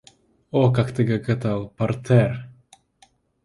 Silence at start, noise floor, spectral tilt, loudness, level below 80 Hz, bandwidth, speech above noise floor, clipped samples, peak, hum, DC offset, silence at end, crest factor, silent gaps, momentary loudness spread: 0.55 s; -59 dBFS; -8.5 dB/octave; -22 LUFS; -52 dBFS; 11.5 kHz; 39 dB; under 0.1%; -4 dBFS; none; under 0.1%; 0.95 s; 18 dB; none; 7 LU